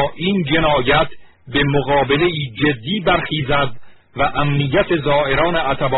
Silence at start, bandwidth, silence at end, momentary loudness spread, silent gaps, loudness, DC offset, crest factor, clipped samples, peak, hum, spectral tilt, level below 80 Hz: 0 s; 4.1 kHz; 0 s; 5 LU; none; -17 LUFS; under 0.1%; 14 dB; under 0.1%; -2 dBFS; none; -4 dB/octave; -34 dBFS